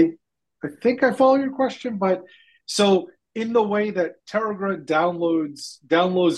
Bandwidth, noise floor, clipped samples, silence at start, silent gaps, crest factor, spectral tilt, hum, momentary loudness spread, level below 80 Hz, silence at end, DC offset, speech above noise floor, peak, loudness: 12.5 kHz; -55 dBFS; under 0.1%; 0 s; none; 16 dB; -5 dB/octave; none; 13 LU; -70 dBFS; 0 s; under 0.1%; 34 dB; -4 dBFS; -22 LUFS